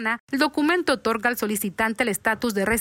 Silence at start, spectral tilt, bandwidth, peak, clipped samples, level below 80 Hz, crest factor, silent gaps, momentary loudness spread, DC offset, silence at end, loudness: 0 s; -3.5 dB/octave; 16.5 kHz; -8 dBFS; under 0.1%; -50 dBFS; 16 dB; 0.20-0.28 s; 4 LU; under 0.1%; 0 s; -23 LUFS